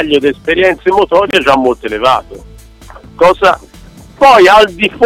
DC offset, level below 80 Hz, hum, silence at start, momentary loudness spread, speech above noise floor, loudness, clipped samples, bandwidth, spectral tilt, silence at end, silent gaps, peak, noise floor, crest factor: under 0.1%; -36 dBFS; none; 0 s; 8 LU; 26 dB; -9 LUFS; under 0.1%; 16 kHz; -4.5 dB/octave; 0 s; none; 0 dBFS; -35 dBFS; 10 dB